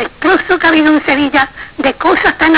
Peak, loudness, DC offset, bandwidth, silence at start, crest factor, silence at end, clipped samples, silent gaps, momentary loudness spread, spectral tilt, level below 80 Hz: -2 dBFS; -11 LUFS; 0.3%; 4 kHz; 0 s; 10 dB; 0 s; under 0.1%; none; 7 LU; -7.5 dB/octave; -40 dBFS